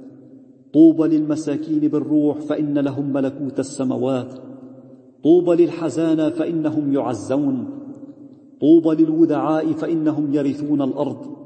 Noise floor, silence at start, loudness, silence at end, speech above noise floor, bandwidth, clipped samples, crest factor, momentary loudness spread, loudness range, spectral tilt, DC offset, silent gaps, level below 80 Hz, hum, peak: -45 dBFS; 0 s; -19 LUFS; 0 s; 27 dB; 8.8 kHz; under 0.1%; 16 dB; 12 LU; 3 LU; -8 dB/octave; under 0.1%; none; -70 dBFS; none; -2 dBFS